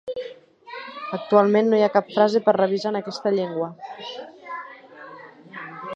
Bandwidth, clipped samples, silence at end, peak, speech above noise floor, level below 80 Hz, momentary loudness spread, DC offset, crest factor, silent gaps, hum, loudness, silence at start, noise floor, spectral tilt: 7.8 kHz; under 0.1%; 0 s; -2 dBFS; 22 dB; -76 dBFS; 23 LU; under 0.1%; 20 dB; none; none; -21 LUFS; 0.05 s; -43 dBFS; -6.5 dB/octave